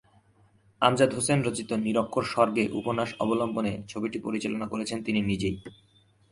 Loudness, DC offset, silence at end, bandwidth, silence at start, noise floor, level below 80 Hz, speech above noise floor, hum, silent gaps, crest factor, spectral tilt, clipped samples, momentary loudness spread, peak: -27 LUFS; under 0.1%; 0.6 s; 11.5 kHz; 0.8 s; -62 dBFS; -56 dBFS; 35 dB; none; none; 22 dB; -5 dB/octave; under 0.1%; 8 LU; -6 dBFS